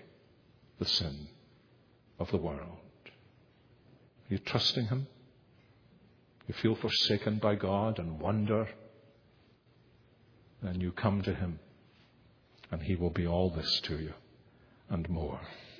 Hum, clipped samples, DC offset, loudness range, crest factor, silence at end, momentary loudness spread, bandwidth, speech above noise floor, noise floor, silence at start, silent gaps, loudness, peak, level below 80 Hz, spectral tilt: none; under 0.1%; under 0.1%; 7 LU; 24 dB; 0 s; 15 LU; 5.4 kHz; 32 dB; -64 dBFS; 0 s; none; -33 LUFS; -12 dBFS; -54 dBFS; -6 dB/octave